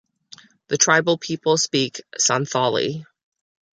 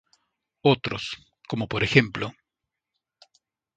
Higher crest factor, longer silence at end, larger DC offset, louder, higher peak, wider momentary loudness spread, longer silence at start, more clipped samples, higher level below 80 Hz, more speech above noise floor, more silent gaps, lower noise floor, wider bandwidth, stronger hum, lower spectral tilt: second, 20 dB vs 28 dB; second, 0.75 s vs 1.45 s; neither; first, -20 LUFS vs -25 LUFS; about the same, -2 dBFS vs 0 dBFS; second, 11 LU vs 15 LU; about the same, 0.7 s vs 0.65 s; neither; second, -66 dBFS vs -54 dBFS; second, 28 dB vs 61 dB; neither; second, -49 dBFS vs -85 dBFS; first, 10 kHz vs 9 kHz; neither; second, -2.5 dB/octave vs -6 dB/octave